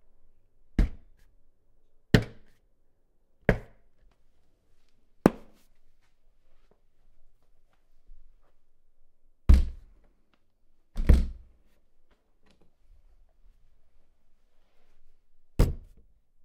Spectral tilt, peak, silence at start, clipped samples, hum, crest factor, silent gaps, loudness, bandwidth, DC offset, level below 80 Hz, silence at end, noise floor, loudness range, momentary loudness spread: -7 dB/octave; 0 dBFS; 0.8 s; under 0.1%; none; 32 dB; none; -28 LUFS; 15 kHz; under 0.1%; -34 dBFS; 0.65 s; -64 dBFS; 7 LU; 19 LU